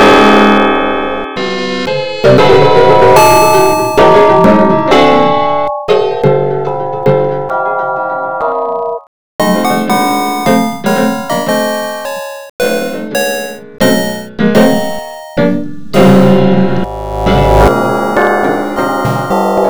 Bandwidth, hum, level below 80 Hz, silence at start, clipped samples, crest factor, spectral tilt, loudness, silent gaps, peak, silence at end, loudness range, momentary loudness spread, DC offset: over 20 kHz; none; -28 dBFS; 0 s; 2%; 10 dB; -5.5 dB/octave; -10 LUFS; 9.07-9.39 s, 12.50-12.59 s; 0 dBFS; 0 s; 7 LU; 11 LU; 4%